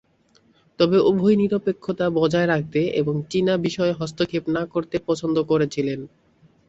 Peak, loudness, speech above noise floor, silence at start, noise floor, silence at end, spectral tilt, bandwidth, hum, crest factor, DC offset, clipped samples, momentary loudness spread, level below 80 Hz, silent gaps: -4 dBFS; -22 LUFS; 39 dB; 0.8 s; -60 dBFS; 0.6 s; -6.5 dB/octave; 8.2 kHz; none; 18 dB; under 0.1%; under 0.1%; 8 LU; -56 dBFS; none